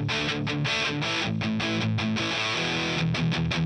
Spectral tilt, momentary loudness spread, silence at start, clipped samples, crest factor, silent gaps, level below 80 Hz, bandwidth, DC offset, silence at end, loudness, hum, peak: -4.5 dB/octave; 2 LU; 0 s; under 0.1%; 12 dB; none; -50 dBFS; 10.5 kHz; under 0.1%; 0 s; -26 LUFS; none; -14 dBFS